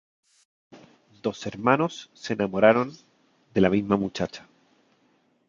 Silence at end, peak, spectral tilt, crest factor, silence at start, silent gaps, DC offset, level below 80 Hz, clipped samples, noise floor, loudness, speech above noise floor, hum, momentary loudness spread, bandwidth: 1.1 s; -2 dBFS; -6.5 dB/octave; 24 dB; 0.75 s; none; under 0.1%; -58 dBFS; under 0.1%; -66 dBFS; -25 LUFS; 42 dB; none; 13 LU; 7.6 kHz